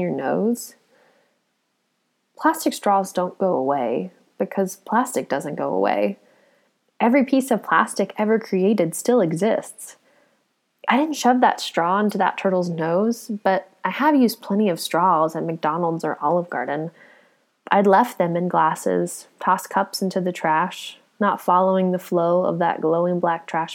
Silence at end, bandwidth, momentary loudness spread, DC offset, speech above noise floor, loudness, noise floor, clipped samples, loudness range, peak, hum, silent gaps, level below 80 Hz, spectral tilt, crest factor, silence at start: 0 s; 18 kHz; 8 LU; under 0.1%; 51 dB; -21 LUFS; -71 dBFS; under 0.1%; 3 LU; -2 dBFS; none; none; -82 dBFS; -5.5 dB/octave; 20 dB; 0 s